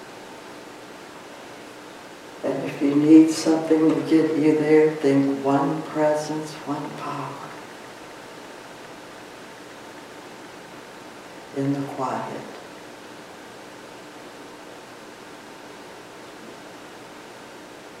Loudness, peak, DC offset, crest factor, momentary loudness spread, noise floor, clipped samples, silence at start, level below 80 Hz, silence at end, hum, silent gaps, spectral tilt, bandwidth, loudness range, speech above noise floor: -21 LUFS; -2 dBFS; under 0.1%; 22 dB; 22 LU; -42 dBFS; under 0.1%; 0 s; -70 dBFS; 0 s; none; none; -6 dB/octave; 13.5 kHz; 22 LU; 21 dB